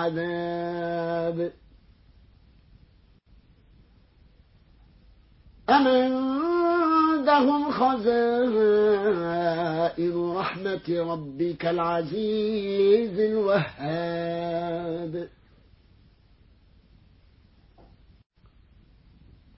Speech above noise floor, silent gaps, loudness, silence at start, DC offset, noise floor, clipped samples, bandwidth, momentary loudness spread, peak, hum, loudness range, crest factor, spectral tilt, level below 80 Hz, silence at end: 33 dB; none; -25 LUFS; 0 s; under 0.1%; -57 dBFS; under 0.1%; 5.8 kHz; 10 LU; -6 dBFS; none; 13 LU; 20 dB; -10.5 dB/octave; -58 dBFS; 4.3 s